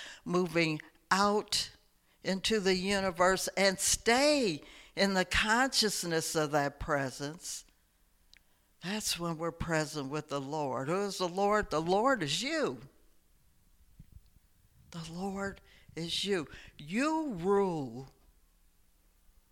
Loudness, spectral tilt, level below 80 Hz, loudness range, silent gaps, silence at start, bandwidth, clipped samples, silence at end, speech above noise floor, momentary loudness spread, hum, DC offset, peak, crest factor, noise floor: -31 LUFS; -3.5 dB/octave; -56 dBFS; 10 LU; none; 0 s; 17 kHz; under 0.1%; 1.4 s; 37 dB; 14 LU; none; under 0.1%; -12 dBFS; 22 dB; -69 dBFS